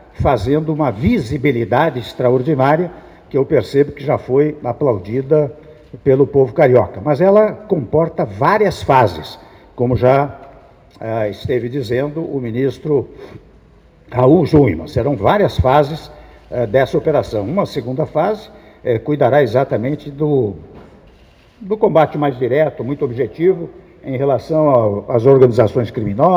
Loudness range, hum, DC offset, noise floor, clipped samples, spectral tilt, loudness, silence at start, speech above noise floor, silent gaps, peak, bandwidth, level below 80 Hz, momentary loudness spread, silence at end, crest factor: 4 LU; none; under 0.1%; -47 dBFS; under 0.1%; -8.5 dB/octave; -15 LUFS; 0.2 s; 32 dB; none; 0 dBFS; 13 kHz; -40 dBFS; 10 LU; 0 s; 16 dB